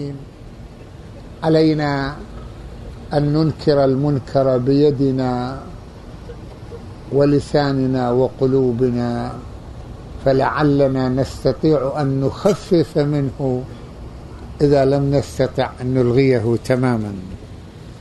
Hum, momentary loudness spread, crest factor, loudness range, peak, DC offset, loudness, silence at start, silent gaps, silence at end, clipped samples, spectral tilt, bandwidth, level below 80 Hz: none; 21 LU; 16 dB; 2 LU; -2 dBFS; under 0.1%; -18 LUFS; 0 s; none; 0 s; under 0.1%; -8 dB/octave; 12 kHz; -38 dBFS